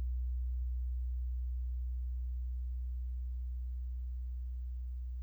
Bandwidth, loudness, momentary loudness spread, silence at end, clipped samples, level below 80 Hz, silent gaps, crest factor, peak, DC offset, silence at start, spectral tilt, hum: 0.3 kHz; -41 LUFS; 4 LU; 0 s; under 0.1%; -38 dBFS; none; 6 dB; -32 dBFS; under 0.1%; 0 s; -9 dB/octave; none